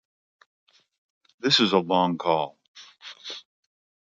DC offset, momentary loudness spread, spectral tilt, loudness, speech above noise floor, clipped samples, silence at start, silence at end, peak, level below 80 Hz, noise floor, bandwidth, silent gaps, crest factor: under 0.1%; 21 LU; -4.5 dB/octave; -23 LUFS; 24 dB; under 0.1%; 1.45 s; 0.75 s; -6 dBFS; -72 dBFS; -46 dBFS; 9.2 kHz; 2.68-2.74 s; 22 dB